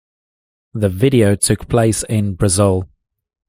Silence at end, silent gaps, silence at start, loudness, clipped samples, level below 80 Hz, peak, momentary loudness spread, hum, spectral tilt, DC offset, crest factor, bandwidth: 0.65 s; none; 0.75 s; -15 LUFS; under 0.1%; -40 dBFS; 0 dBFS; 8 LU; none; -5.5 dB/octave; under 0.1%; 16 dB; 16 kHz